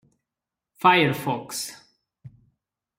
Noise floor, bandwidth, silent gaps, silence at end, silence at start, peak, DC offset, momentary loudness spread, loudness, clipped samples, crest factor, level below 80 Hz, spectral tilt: -88 dBFS; 16 kHz; none; 0.7 s; 0.85 s; -6 dBFS; under 0.1%; 14 LU; -22 LUFS; under 0.1%; 22 dB; -68 dBFS; -4 dB/octave